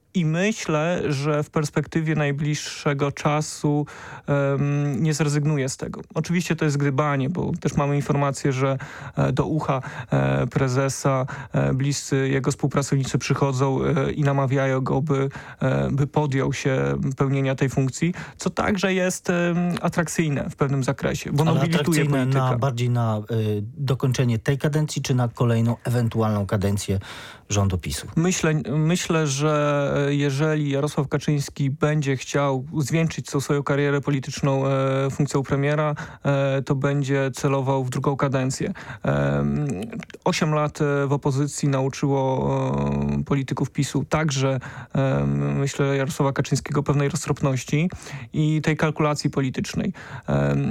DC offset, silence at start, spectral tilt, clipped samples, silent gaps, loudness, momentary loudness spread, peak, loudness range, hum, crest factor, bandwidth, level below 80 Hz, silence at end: under 0.1%; 0.15 s; -6 dB/octave; under 0.1%; none; -23 LUFS; 5 LU; -8 dBFS; 2 LU; none; 14 dB; 15 kHz; -48 dBFS; 0 s